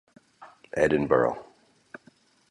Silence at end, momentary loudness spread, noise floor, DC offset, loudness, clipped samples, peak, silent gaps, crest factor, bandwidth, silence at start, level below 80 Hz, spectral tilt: 1.05 s; 26 LU; -60 dBFS; under 0.1%; -25 LUFS; under 0.1%; -8 dBFS; none; 22 dB; 11.5 kHz; 0.4 s; -56 dBFS; -6.5 dB/octave